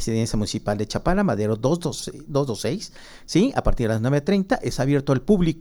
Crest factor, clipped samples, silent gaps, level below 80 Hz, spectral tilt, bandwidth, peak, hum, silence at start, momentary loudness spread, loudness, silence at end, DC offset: 18 dB; under 0.1%; none; -34 dBFS; -6 dB/octave; 17.5 kHz; -4 dBFS; none; 0 s; 7 LU; -23 LUFS; 0 s; under 0.1%